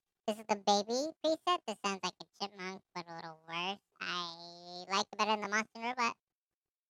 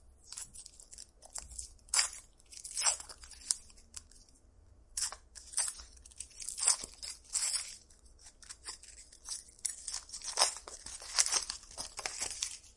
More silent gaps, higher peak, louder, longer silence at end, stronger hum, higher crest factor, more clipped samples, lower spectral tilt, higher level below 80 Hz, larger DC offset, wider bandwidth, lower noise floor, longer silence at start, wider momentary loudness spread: neither; second, -14 dBFS vs -6 dBFS; about the same, -36 LUFS vs -35 LUFS; first, 0.75 s vs 0.05 s; neither; second, 22 dB vs 34 dB; neither; first, -2.5 dB/octave vs 2 dB/octave; second, -86 dBFS vs -62 dBFS; neither; first, 16 kHz vs 11.5 kHz; first, under -90 dBFS vs -62 dBFS; first, 0.25 s vs 0.05 s; second, 14 LU vs 20 LU